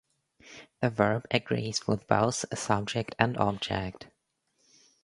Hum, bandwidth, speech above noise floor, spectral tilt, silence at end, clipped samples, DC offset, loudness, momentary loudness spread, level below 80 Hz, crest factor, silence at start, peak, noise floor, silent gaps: none; 11.5 kHz; 47 dB; -4.5 dB/octave; 0.95 s; under 0.1%; under 0.1%; -29 LUFS; 16 LU; -58 dBFS; 28 dB; 0.45 s; -2 dBFS; -76 dBFS; none